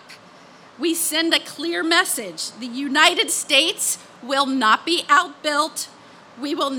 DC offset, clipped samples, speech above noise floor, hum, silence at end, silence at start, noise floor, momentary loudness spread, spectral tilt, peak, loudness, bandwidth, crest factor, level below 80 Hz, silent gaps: under 0.1%; under 0.1%; 26 dB; none; 0 s; 0.1 s; -46 dBFS; 13 LU; 0 dB/octave; 0 dBFS; -19 LUFS; 18 kHz; 20 dB; -76 dBFS; none